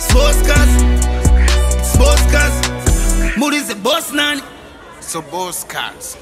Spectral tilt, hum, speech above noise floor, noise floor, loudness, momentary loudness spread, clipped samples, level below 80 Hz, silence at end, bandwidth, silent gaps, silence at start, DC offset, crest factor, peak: -4 dB/octave; none; 21 dB; -35 dBFS; -15 LUFS; 11 LU; under 0.1%; -14 dBFS; 0.05 s; 16 kHz; none; 0 s; under 0.1%; 14 dB; 0 dBFS